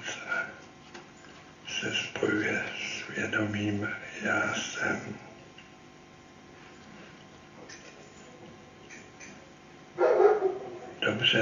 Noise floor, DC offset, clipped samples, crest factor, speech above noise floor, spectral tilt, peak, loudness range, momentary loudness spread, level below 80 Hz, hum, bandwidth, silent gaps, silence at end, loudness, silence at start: -52 dBFS; under 0.1%; under 0.1%; 24 dB; 21 dB; -4 dB/octave; -10 dBFS; 19 LU; 24 LU; -68 dBFS; none; 7.4 kHz; none; 0 s; -29 LUFS; 0 s